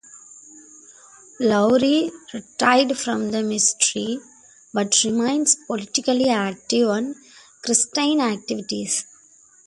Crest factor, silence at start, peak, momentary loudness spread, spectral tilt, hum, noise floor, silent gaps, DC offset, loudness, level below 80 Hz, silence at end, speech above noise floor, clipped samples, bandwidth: 20 dB; 0.15 s; -2 dBFS; 12 LU; -2.5 dB/octave; none; -53 dBFS; none; under 0.1%; -20 LUFS; -64 dBFS; 0.65 s; 32 dB; under 0.1%; 11.5 kHz